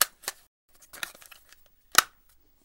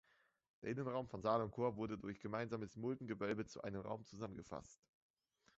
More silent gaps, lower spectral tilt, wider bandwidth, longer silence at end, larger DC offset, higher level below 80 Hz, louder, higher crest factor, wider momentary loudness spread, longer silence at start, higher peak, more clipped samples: first, 0.47-0.68 s vs none; second, 1.5 dB/octave vs -6 dB/octave; first, 17 kHz vs 8 kHz; second, 0.6 s vs 0.85 s; neither; first, -66 dBFS vs -72 dBFS; first, -27 LUFS vs -45 LUFS; first, 30 dB vs 22 dB; first, 24 LU vs 11 LU; second, 0 s vs 0.6 s; first, -2 dBFS vs -24 dBFS; neither